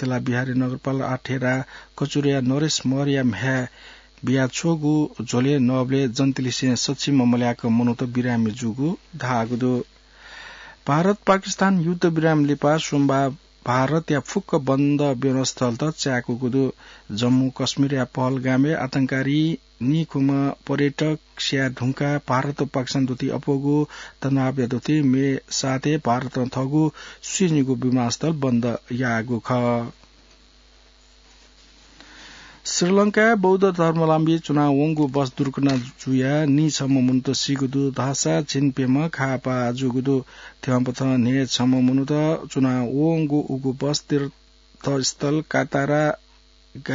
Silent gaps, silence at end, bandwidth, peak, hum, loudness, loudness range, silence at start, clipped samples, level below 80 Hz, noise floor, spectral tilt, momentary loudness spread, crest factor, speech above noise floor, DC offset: none; 0 s; 7.8 kHz; -4 dBFS; none; -22 LUFS; 3 LU; 0 s; under 0.1%; -54 dBFS; -53 dBFS; -5.5 dB/octave; 6 LU; 18 dB; 32 dB; under 0.1%